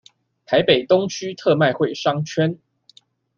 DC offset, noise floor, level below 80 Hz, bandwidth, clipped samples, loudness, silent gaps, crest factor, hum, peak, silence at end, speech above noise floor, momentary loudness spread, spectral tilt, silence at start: under 0.1%; -54 dBFS; -60 dBFS; 7.2 kHz; under 0.1%; -19 LUFS; none; 18 dB; none; -2 dBFS; 0.85 s; 36 dB; 7 LU; -5.5 dB/octave; 0.5 s